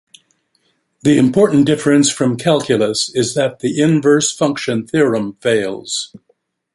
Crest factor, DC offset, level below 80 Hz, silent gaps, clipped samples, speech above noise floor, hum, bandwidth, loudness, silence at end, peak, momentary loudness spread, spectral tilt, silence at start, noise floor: 14 dB; under 0.1%; -56 dBFS; none; under 0.1%; 49 dB; none; 11.5 kHz; -15 LUFS; 0.6 s; -2 dBFS; 8 LU; -4.5 dB/octave; 1.05 s; -63 dBFS